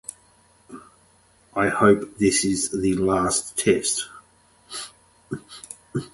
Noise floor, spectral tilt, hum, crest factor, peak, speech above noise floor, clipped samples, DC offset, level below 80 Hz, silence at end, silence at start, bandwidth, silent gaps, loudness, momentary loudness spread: -58 dBFS; -4 dB/octave; none; 22 dB; -4 dBFS; 37 dB; under 0.1%; under 0.1%; -52 dBFS; 0.05 s; 0.7 s; 12 kHz; none; -21 LUFS; 18 LU